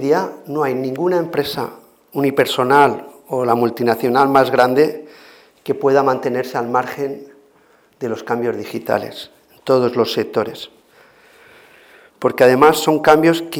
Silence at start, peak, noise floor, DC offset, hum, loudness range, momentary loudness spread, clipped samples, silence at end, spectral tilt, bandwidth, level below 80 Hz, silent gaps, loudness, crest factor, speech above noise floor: 0 s; 0 dBFS; -53 dBFS; under 0.1%; none; 7 LU; 16 LU; under 0.1%; 0 s; -5.5 dB/octave; 18 kHz; -60 dBFS; none; -16 LUFS; 16 dB; 37 dB